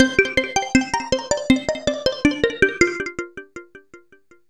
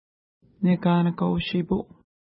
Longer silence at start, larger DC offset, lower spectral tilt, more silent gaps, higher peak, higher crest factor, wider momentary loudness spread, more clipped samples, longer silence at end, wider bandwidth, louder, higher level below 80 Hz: second, 0 s vs 0.6 s; first, 0.1% vs under 0.1%; second, -3.5 dB/octave vs -12 dB/octave; neither; first, -2 dBFS vs -10 dBFS; first, 20 dB vs 14 dB; first, 16 LU vs 8 LU; neither; about the same, 0.55 s vs 0.55 s; first, 12 kHz vs 5.6 kHz; first, -20 LUFS vs -24 LUFS; first, -42 dBFS vs -52 dBFS